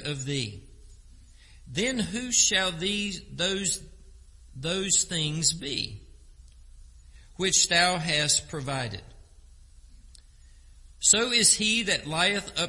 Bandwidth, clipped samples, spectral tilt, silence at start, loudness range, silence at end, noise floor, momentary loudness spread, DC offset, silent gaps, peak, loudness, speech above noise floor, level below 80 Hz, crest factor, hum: 11.5 kHz; under 0.1%; -1.5 dB/octave; 0 s; 4 LU; 0 s; -52 dBFS; 13 LU; under 0.1%; none; -4 dBFS; -24 LUFS; 26 dB; -50 dBFS; 24 dB; none